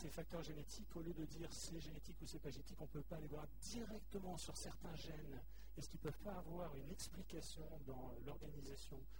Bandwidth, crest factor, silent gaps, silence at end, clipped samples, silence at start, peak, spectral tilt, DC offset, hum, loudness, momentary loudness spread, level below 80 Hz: 16 kHz; 16 dB; none; 0 s; under 0.1%; 0 s; -34 dBFS; -5 dB/octave; 0.2%; none; -53 LUFS; 5 LU; -58 dBFS